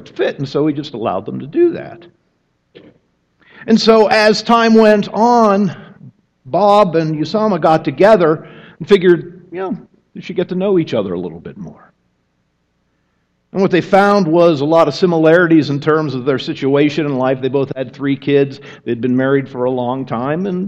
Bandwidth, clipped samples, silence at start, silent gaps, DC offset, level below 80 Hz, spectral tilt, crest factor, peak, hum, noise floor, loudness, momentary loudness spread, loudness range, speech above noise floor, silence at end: 10 kHz; under 0.1%; 0.15 s; none; under 0.1%; -54 dBFS; -6.5 dB/octave; 14 dB; 0 dBFS; none; -64 dBFS; -14 LUFS; 14 LU; 9 LU; 51 dB; 0 s